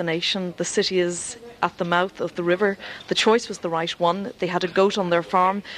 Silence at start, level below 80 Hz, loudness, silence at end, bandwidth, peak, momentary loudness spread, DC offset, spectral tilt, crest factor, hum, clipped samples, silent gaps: 0 s; -62 dBFS; -23 LUFS; 0 s; 12.5 kHz; -4 dBFS; 7 LU; under 0.1%; -4 dB/octave; 18 dB; none; under 0.1%; none